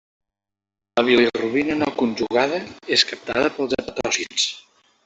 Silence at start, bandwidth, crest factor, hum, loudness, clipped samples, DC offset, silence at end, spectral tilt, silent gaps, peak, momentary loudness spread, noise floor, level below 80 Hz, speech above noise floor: 0.95 s; 8.4 kHz; 20 dB; none; -21 LUFS; under 0.1%; under 0.1%; 0.45 s; -2.5 dB/octave; none; -2 dBFS; 8 LU; -87 dBFS; -56 dBFS; 66 dB